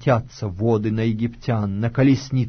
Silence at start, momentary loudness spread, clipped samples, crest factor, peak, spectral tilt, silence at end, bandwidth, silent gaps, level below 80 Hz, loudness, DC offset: 0 s; 6 LU; under 0.1%; 14 dB; -6 dBFS; -8 dB/octave; 0 s; 6.6 kHz; none; -46 dBFS; -21 LUFS; under 0.1%